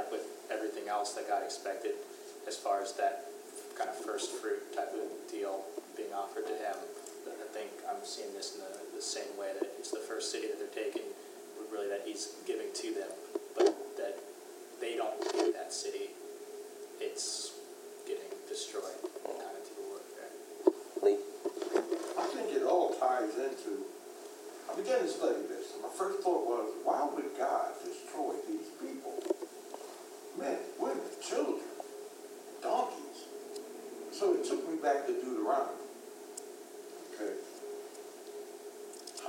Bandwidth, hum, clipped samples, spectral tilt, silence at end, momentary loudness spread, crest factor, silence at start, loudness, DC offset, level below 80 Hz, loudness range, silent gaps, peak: 16 kHz; none; under 0.1%; -2 dB/octave; 0 s; 15 LU; 26 dB; 0 s; -37 LUFS; under 0.1%; under -90 dBFS; 7 LU; none; -12 dBFS